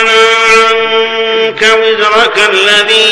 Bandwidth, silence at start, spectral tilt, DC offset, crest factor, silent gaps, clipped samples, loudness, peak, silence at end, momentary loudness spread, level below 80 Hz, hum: 14.5 kHz; 0 s; -0.5 dB/octave; under 0.1%; 8 dB; none; 0.9%; -6 LUFS; 0 dBFS; 0 s; 5 LU; -46 dBFS; none